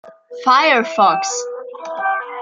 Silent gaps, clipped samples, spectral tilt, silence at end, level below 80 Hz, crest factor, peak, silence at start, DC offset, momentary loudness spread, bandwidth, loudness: none; under 0.1%; -1.5 dB/octave; 0 s; -74 dBFS; 16 dB; -2 dBFS; 0.05 s; under 0.1%; 16 LU; 9.4 kHz; -16 LUFS